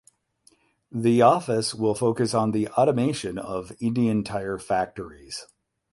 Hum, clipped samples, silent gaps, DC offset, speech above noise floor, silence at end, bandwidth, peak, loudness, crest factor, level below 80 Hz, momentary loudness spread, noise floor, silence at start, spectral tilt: none; under 0.1%; none; under 0.1%; 39 dB; 0.5 s; 11.5 kHz; -4 dBFS; -24 LUFS; 20 dB; -58 dBFS; 17 LU; -62 dBFS; 0.95 s; -6 dB/octave